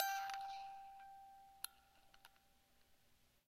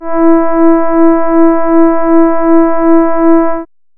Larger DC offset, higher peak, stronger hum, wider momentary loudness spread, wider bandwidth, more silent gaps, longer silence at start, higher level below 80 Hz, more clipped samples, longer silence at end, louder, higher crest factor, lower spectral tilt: neither; second, -22 dBFS vs 0 dBFS; first, 60 Hz at -90 dBFS vs none; first, 22 LU vs 1 LU; first, 16 kHz vs 2.8 kHz; neither; about the same, 0 s vs 0 s; second, -82 dBFS vs -38 dBFS; neither; about the same, 0.35 s vs 0.35 s; second, -50 LUFS vs -9 LUFS; first, 28 dB vs 6 dB; second, 1.5 dB/octave vs -12 dB/octave